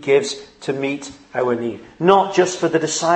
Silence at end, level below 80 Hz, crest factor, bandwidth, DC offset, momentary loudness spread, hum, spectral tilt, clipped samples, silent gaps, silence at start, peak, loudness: 0 s; -60 dBFS; 18 dB; 8.8 kHz; under 0.1%; 13 LU; none; -4 dB/octave; under 0.1%; none; 0 s; 0 dBFS; -19 LUFS